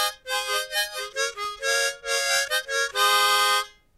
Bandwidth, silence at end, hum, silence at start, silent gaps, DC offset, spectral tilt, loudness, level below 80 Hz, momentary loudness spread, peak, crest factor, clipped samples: 16 kHz; 0.3 s; none; 0 s; none; under 0.1%; 2.5 dB/octave; -23 LUFS; -62 dBFS; 9 LU; -10 dBFS; 16 dB; under 0.1%